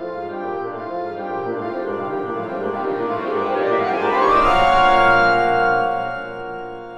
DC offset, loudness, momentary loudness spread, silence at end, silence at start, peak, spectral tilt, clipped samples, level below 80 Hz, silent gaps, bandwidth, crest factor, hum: under 0.1%; -19 LUFS; 14 LU; 0 s; 0 s; -2 dBFS; -5.5 dB/octave; under 0.1%; -40 dBFS; none; 10.5 kHz; 16 dB; none